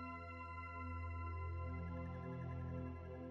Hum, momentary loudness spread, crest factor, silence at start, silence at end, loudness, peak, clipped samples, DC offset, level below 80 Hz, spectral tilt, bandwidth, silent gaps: none; 3 LU; 10 dB; 0 s; 0 s; -48 LUFS; -36 dBFS; under 0.1%; under 0.1%; -56 dBFS; -9.5 dB/octave; 5.8 kHz; none